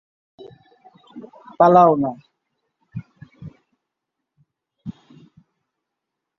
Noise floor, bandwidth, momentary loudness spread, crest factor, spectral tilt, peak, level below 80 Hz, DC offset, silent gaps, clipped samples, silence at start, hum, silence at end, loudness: -82 dBFS; 6.2 kHz; 29 LU; 22 dB; -9 dB/octave; -2 dBFS; -64 dBFS; under 0.1%; none; under 0.1%; 1.15 s; none; 1.5 s; -15 LUFS